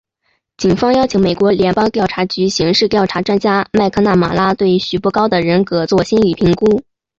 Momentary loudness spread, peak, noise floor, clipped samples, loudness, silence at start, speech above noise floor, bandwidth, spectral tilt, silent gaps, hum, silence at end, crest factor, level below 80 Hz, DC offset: 3 LU; -2 dBFS; -65 dBFS; under 0.1%; -14 LUFS; 0.6 s; 52 dB; 7.8 kHz; -6 dB/octave; none; none; 0.35 s; 12 dB; -42 dBFS; under 0.1%